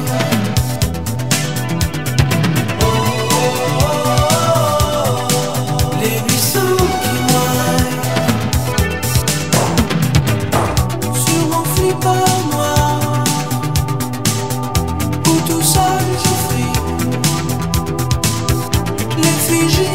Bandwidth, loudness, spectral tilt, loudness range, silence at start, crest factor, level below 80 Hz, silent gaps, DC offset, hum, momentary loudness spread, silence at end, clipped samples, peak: 16.5 kHz; -15 LUFS; -4.5 dB/octave; 2 LU; 0 s; 16 dB; -28 dBFS; none; 2%; none; 5 LU; 0 s; under 0.1%; 0 dBFS